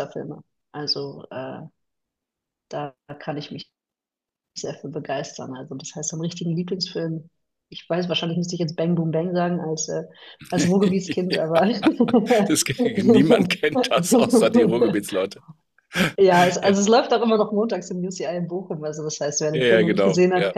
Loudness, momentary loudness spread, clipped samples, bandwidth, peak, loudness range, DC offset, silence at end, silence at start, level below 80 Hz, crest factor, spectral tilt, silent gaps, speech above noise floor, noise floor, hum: -21 LUFS; 17 LU; under 0.1%; 14.5 kHz; -2 dBFS; 15 LU; under 0.1%; 0 s; 0 s; -62 dBFS; 18 dB; -5 dB/octave; none; 68 dB; -89 dBFS; none